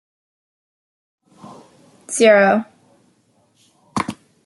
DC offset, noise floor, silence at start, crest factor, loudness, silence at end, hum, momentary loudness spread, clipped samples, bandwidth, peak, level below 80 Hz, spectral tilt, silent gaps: under 0.1%; -60 dBFS; 2.1 s; 20 dB; -16 LUFS; 0.3 s; none; 17 LU; under 0.1%; 12 kHz; -2 dBFS; -64 dBFS; -4 dB/octave; none